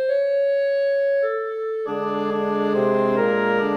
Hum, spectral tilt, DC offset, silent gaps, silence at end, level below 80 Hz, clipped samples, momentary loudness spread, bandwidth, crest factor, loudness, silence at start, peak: none; -7.5 dB/octave; under 0.1%; none; 0 s; -66 dBFS; under 0.1%; 6 LU; 6.4 kHz; 12 dB; -21 LUFS; 0 s; -8 dBFS